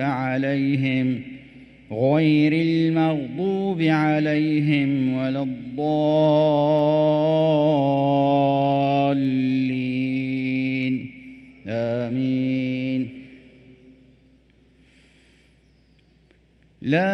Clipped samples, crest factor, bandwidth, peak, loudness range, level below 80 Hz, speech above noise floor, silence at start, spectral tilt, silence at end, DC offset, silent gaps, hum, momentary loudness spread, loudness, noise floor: under 0.1%; 14 dB; 6.2 kHz; -8 dBFS; 9 LU; -60 dBFS; 37 dB; 0 s; -9 dB/octave; 0 s; under 0.1%; none; none; 9 LU; -21 LUFS; -58 dBFS